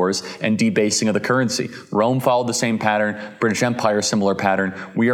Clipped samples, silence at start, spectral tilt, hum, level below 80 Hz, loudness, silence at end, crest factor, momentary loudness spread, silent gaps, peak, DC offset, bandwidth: under 0.1%; 0 s; -4.5 dB/octave; none; -68 dBFS; -20 LUFS; 0 s; 18 dB; 5 LU; none; 0 dBFS; under 0.1%; 16.5 kHz